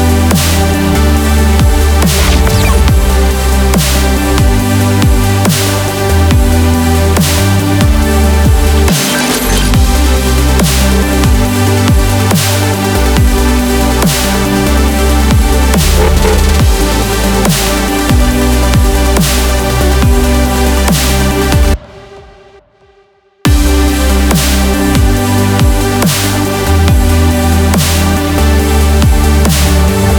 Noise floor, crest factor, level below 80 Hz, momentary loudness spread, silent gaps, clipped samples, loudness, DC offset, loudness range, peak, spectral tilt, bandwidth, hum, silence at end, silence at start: -47 dBFS; 8 dB; -12 dBFS; 2 LU; none; under 0.1%; -9 LUFS; under 0.1%; 2 LU; 0 dBFS; -5 dB/octave; over 20 kHz; none; 0 s; 0 s